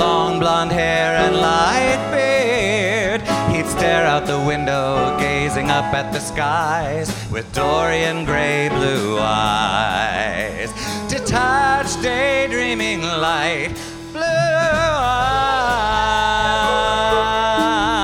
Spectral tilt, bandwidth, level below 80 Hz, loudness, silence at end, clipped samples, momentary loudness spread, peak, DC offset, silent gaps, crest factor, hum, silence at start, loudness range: -4 dB/octave; 17 kHz; -36 dBFS; -18 LUFS; 0 s; under 0.1%; 6 LU; 0 dBFS; under 0.1%; none; 18 dB; none; 0 s; 3 LU